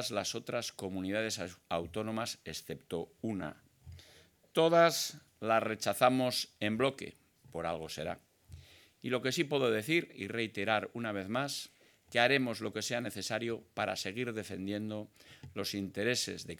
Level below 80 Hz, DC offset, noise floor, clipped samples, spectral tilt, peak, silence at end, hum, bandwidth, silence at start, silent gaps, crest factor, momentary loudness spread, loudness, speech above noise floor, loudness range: -72 dBFS; under 0.1%; -63 dBFS; under 0.1%; -4 dB/octave; -12 dBFS; 0.05 s; none; 19 kHz; 0 s; none; 24 dB; 14 LU; -34 LUFS; 29 dB; 7 LU